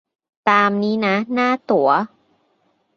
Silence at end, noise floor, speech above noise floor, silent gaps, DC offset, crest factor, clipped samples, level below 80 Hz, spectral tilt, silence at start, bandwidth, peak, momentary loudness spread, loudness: 0.9 s; -64 dBFS; 47 dB; none; under 0.1%; 18 dB; under 0.1%; -66 dBFS; -6.5 dB/octave; 0.45 s; 7 kHz; -2 dBFS; 5 LU; -18 LUFS